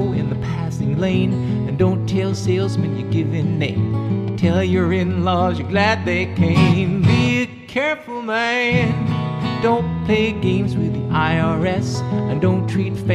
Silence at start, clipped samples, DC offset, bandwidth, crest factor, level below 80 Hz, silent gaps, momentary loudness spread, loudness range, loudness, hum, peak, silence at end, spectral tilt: 0 s; under 0.1%; under 0.1%; 11 kHz; 16 dB; -42 dBFS; none; 6 LU; 2 LU; -19 LUFS; none; -2 dBFS; 0 s; -7 dB/octave